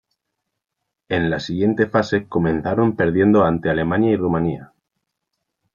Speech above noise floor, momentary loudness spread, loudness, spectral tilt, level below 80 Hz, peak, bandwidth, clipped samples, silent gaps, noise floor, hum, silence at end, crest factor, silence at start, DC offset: 62 dB; 7 LU; -19 LUFS; -8 dB/octave; -50 dBFS; -2 dBFS; 7.4 kHz; under 0.1%; none; -80 dBFS; none; 1.1 s; 18 dB; 1.1 s; under 0.1%